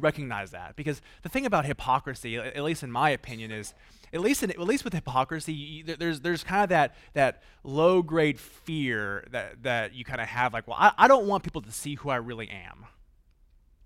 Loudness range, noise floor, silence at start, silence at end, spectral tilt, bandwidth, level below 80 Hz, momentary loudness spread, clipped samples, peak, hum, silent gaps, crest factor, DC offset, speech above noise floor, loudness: 5 LU; -60 dBFS; 0 s; 1 s; -5 dB/octave; 16 kHz; -54 dBFS; 15 LU; under 0.1%; -4 dBFS; none; none; 24 dB; under 0.1%; 33 dB; -27 LUFS